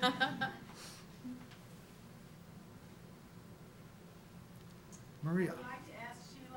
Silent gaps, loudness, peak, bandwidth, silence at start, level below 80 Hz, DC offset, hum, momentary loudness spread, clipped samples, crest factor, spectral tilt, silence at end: none; -41 LUFS; -16 dBFS; 17.5 kHz; 0 s; -70 dBFS; under 0.1%; none; 19 LU; under 0.1%; 28 dB; -5 dB/octave; 0 s